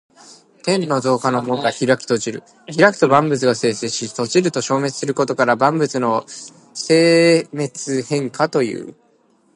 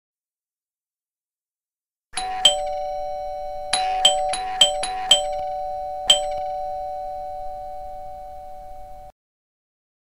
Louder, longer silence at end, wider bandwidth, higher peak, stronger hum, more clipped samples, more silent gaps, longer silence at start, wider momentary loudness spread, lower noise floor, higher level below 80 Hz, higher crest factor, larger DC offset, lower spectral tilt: first, -17 LUFS vs -21 LUFS; second, 0.65 s vs 1.05 s; second, 11.5 kHz vs 16 kHz; about the same, 0 dBFS vs 0 dBFS; neither; neither; neither; first, 0.65 s vs 0.1 s; second, 14 LU vs 20 LU; second, -57 dBFS vs under -90 dBFS; second, -66 dBFS vs -46 dBFS; second, 18 dB vs 24 dB; second, under 0.1% vs 0.5%; first, -4.5 dB/octave vs 1 dB/octave